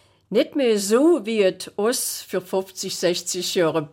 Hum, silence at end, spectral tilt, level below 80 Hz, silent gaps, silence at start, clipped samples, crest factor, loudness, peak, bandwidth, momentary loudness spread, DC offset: none; 0.05 s; -3.5 dB/octave; -70 dBFS; none; 0.3 s; under 0.1%; 14 dB; -22 LUFS; -8 dBFS; 17 kHz; 8 LU; under 0.1%